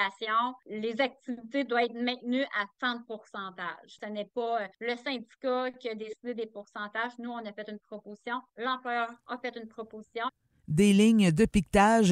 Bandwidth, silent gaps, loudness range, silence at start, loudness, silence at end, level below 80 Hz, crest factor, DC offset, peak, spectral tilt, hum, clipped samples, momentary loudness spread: 12.5 kHz; none; 9 LU; 0 s; -30 LUFS; 0 s; -54 dBFS; 20 dB; under 0.1%; -10 dBFS; -5.5 dB/octave; none; under 0.1%; 17 LU